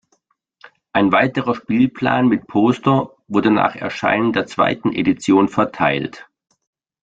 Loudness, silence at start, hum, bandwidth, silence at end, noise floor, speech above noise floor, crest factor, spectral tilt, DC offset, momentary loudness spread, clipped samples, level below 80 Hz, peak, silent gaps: -17 LUFS; 0.65 s; none; 8.8 kHz; 0.8 s; -65 dBFS; 49 dB; 16 dB; -6.5 dB/octave; under 0.1%; 6 LU; under 0.1%; -54 dBFS; -2 dBFS; none